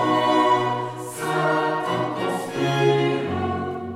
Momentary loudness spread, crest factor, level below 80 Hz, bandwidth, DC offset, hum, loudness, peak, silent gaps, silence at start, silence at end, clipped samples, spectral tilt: 9 LU; 16 dB; -58 dBFS; 16 kHz; under 0.1%; none; -22 LUFS; -6 dBFS; none; 0 s; 0 s; under 0.1%; -5.5 dB/octave